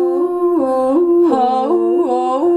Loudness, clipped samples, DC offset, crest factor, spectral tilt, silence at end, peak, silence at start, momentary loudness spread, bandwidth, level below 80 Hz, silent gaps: -14 LUFS; under 0.1%; under 0.1%; 10 dB; -6.5 dB/octave; 0 s; -4 dBFS; 0 s; 3 LU; 9 kHz; -58 dBFS; none